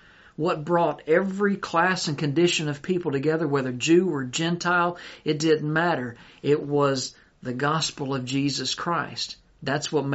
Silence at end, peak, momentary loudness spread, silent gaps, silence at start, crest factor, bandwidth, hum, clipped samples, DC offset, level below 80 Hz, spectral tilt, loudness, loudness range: 0 s; -6 dBFS; 9 LU; none; 0.4 s; 18 dB; 8 kHz; none; under 0.1%; under 0.1%; -62 dBFS; -4 dB/octave; -25 LUFS; 3 LU